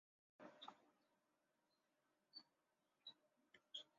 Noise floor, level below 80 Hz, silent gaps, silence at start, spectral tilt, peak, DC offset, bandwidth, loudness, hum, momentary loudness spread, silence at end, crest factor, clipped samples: -88 dBFS; under -90 dBFS; none; 0.4 s; 0.5 dB/octave; -42 dBFS; under 0.1%; 7.2 kHz; -62 LUFS; none; 7 LU; 0 s; 26 dB; under 0.1%